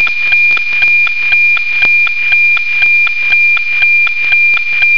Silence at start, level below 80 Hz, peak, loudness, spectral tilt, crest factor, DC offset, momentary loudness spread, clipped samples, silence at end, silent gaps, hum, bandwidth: 0 s; -50 dBFS; 0 dBFS; -7 LUFS; -0.5 dB/octave; 10 dB; 10%; 1 LU; under 0.1%; 0 s; none; none; 5.4 kHz